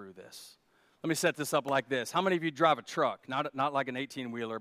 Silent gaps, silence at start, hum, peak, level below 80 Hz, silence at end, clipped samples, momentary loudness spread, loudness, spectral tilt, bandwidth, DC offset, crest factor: none; 0 s; none; -12 dBFS; -82 dBFS; 0 s; under 0.1%; 13 LU; -31 LUFS; -4 dB/octave; 15.5 kHz; under 0.1%; 20 dB